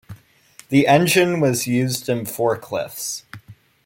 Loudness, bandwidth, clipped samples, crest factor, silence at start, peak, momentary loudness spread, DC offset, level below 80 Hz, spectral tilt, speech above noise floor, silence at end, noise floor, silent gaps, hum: -19 LUFS; 17 kHz; under 0.1%; 18 dB; 0.1 s; -2 dBFS; 13 LU; under 0.1%; -60 dBFS; -4.5 dB/octave; 31 dB; 0.3 s; -50 dBFS; none; none